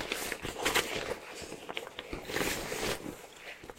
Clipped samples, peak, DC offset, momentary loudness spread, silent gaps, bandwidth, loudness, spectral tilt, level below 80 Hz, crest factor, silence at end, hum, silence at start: under 0.1%; -12 dBFS; under 0.1%; 14 LU; none; 16 kHz; -35 LUFS; -2 dB/octave; -54 dBFS; 26 dB; 0 s; none; 0 s